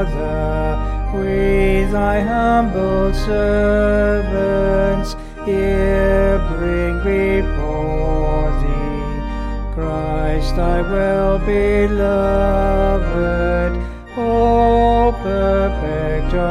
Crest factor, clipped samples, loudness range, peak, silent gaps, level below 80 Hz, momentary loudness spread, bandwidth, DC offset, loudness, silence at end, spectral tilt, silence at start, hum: 12 dB; under 0.1%; 4 LU; -4 dBFS; none; -20 dBFS; 7 LU; 10.5 kHz; under 0.1%; -17 LUFS; 0 s; -8 dB/octave; 0 s; none